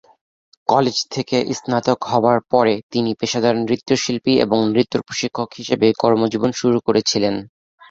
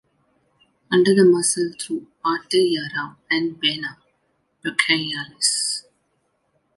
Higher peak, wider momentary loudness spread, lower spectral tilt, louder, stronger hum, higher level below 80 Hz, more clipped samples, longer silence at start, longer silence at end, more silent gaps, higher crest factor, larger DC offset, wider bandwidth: about the same, 0 dBFS vs -2 dBFS; second, 6 LU vs 14 LU; first, -5 dB/octave vs -3 dB/octave; about the same, -18 LUFS vs -20 LUFS; neither; first, -56 dBFS vs -68 dBFS; neither; second, 0.7 s vs 0.9 s; second, 0.45 s vs 0.95 s; first, 2.83-2.90 s vs none; about the same, 18 dB vs 20 dB; neither; second, 7.8 kHz vs 11.5 kHz